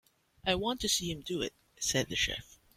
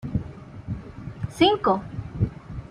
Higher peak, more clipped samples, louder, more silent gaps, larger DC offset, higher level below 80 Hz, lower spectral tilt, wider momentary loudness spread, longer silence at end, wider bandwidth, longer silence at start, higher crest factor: second, -14 dBFS vs -4 dBFS; neither; second, -33 LUFS vs -25 LUFS; neither; neither; second, -54 dBFS vs -44 dBFS; second, -2.5 dB/octave vs -6.5 dB/octave; second, 7 LU vs 19 LU; first, 0.35 s vs 0 s; first, 16.5 kHz vs 12.5 kHz; first, 0.45 s vs 0 s; about the same, 22 dB vs 22 dB